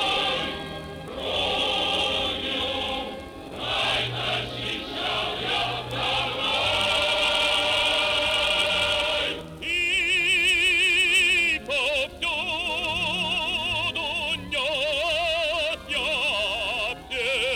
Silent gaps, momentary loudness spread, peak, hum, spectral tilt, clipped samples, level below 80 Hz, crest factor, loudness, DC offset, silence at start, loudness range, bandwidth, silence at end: none; 10 LU; -10 dBFS; none; -2 dB/octave; under 0.1%; -48 dBFS; 16 dB; -23 LUFS; under 0.1%; 0 s; 6 LU; 20 kHz; 0 s